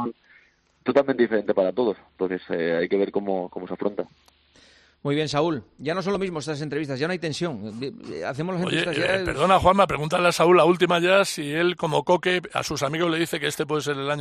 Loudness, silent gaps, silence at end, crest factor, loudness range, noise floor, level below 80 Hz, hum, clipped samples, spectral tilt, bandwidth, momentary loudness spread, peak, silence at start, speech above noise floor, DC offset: -23 LUFS; none; 0 s; 18 dB; 8 LU; -59 dBFS; -52 dBFS; none; under 0.1%; -5 dB/octave; 14 kHz; 12 LU; -4 dBFS; 0 s; 36 dB; under 0.1%